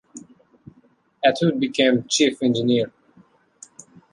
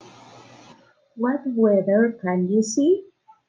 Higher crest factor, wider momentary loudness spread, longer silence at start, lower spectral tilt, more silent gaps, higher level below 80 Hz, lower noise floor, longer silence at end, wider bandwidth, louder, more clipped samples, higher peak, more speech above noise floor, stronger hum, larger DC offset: about the same, 20 dB vs 16 dB; second, 3 LU vs 6 LU; second, 0.15 s vs 1.15 s; second, -4.5 dB/octave vs -6 dB/octave; neither; first, -66 dBFS vs -74 dBFS; first, -59 dBFS vs -53 dBFS; first, 1.25 s vs 0.45 s; first, 11 kHz vs 9.6 kHz; about the same, -20 LUFS vs -21 LUFS; neither; first, -4 dBFS vs -8 dBFS; first, 39 dB vs 33 dB; neither; neither